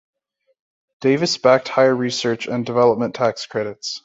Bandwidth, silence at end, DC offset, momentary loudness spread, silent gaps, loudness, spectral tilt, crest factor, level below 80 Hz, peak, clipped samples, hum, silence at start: 8 kHz; 0.05 s; under 0.1%; 10 LU; none; -19 LUFS; -4.5 dB/octave; 18 dB; -62 dBFS; -2 dBFS; under 0.1%; none; 1 s